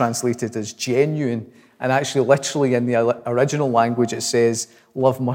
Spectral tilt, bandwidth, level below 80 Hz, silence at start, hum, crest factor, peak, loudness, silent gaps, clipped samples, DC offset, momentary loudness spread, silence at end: -5 dB/octave; 17 kHz; -72 dBFS; 0 s; none; 18 dB; -2 dBFS; -20 LUFS; none; under 0.1%; under 0.1%; 9 LU; 0 s